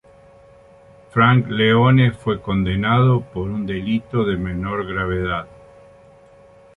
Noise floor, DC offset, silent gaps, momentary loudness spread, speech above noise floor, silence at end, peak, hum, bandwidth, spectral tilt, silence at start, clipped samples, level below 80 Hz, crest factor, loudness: -48 dBFS; under 0.1%; none; 10 LU; 30 dB; 1.3 s; -2 dBFS; none; 4 kHz; -8.5 dB/octave; 1.15 s; under 0.1%; -40 dBFS; 18 dB; -19 LUFS